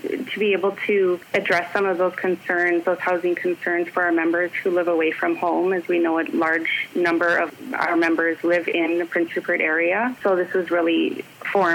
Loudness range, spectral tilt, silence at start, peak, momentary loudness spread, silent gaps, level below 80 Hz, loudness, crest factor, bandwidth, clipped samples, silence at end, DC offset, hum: 1 LU; -5.5 dB/octave; 0 s; -6 dBFS; 4 LU; none; -76 dBFS; -21 LUFS; 16 dB; 16.5 kHz; under 0.1%; 0 s; under 0.1%; none